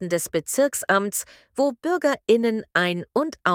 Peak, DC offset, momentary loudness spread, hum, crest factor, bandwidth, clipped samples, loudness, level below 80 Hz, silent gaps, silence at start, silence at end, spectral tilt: -4 dBFS; under 0.1%; 6 LU; none; 18 dB; 18 kHz; under 0.1%; -23 LUFS; -66 dBFS; none; 0 s; 0 s; -3.5 dB/octave